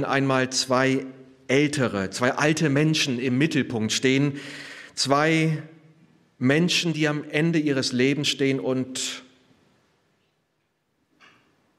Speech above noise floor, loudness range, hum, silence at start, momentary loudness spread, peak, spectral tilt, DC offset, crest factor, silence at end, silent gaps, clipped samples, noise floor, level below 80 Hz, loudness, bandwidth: 50 dB; 5 LU; none; 0 s; 8 LU; -4 dBFS; -4.5 dB/octave; under 0.1%; 20 dB; 2.55 s; none; under 0.1%; -73 dBFS; -70 dBFS; -23 LUFS; 14.5 kHz